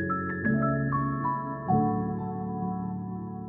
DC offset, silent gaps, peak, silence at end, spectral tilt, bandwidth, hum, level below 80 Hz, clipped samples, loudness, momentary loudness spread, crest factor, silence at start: under 0.1%; none; -14 dBFS; 0 s; -13.5 dB/octave; 2.5 kHz; none; -52 dBFS; under 0.1%; -29 LUFS; 8 LU; 16 dB; 0 s